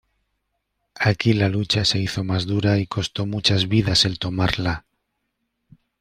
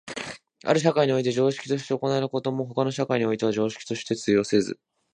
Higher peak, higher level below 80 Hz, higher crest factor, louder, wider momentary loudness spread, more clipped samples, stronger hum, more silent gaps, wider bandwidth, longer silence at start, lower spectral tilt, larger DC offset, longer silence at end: about the same, -2 dBFS vs -4 dBFS; first, -46 dBFS vs -66 dBFS; about the same, 20 dB vs 20 dB; first, -21 LUFS vs -25 LUFS; second, 7 LU vs 11 LU; neither; neither; neither; first, 13 kHz vs 10 kHz; first, 0.95 s vs 0.05 s; about the same, -5 dB/octave vs -5.5 dB/octave; neither; first, 1.2 s vs 0.4 s